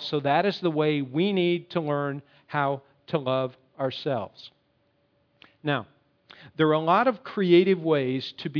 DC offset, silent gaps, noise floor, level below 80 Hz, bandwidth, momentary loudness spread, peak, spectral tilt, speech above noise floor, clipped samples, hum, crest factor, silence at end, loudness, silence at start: under 0.1%; none; -68 dBFS; -76 dBFS; 5.4 kHz; 12 LU; -6 dBFS; -8 dB/octave; 44 dB; under 0.1%; none; 20 dB; 0 s; -25 LUFS; 0 s